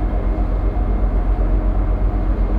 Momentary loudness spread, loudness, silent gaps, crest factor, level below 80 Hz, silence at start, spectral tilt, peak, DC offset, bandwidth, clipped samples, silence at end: 1 LU; -21 LUFS; none; 10 dB; -18 dBFS; 0 s; -10.5 dB/octave; -8 dBFS; under 0.1%; 2.9 kHz; under 0.1%; 0 s